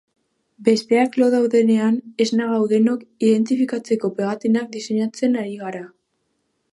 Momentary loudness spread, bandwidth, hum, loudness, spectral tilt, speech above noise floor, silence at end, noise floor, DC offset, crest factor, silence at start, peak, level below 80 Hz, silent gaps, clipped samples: 7 LU; 11.5 kHz; none; -19 LUFS; -6 dB/octave; 52 dB; 0.85 s; -71 dBFS; under 0.1%; 18 dB; 0.6 s; -2 dBFS; -74 dBFS; none; under 0.1%